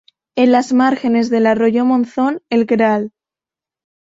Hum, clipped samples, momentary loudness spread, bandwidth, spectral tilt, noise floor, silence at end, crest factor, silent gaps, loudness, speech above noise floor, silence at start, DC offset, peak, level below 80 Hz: none; under 0.1%; 6 LU; 7.8 kHz; -6 dB/octave; -89 dBFS; 1.05 s; 14 dB; none; -15 LUFS; 75 dB; 0.35 s; under 0.1%; -2 dBFS; -60 dBFS